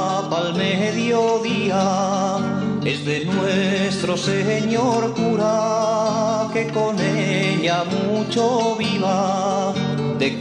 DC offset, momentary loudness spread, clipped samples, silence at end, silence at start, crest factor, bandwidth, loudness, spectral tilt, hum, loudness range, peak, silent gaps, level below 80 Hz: under 0.1%; 3 LU; under 0.1%; 0 s; 0 s; 12 dB; 10.5 kHz; -20 LUFS; -5.5 dB/octave; none; 1 LU; -6 dBFS; none; -60 dBFS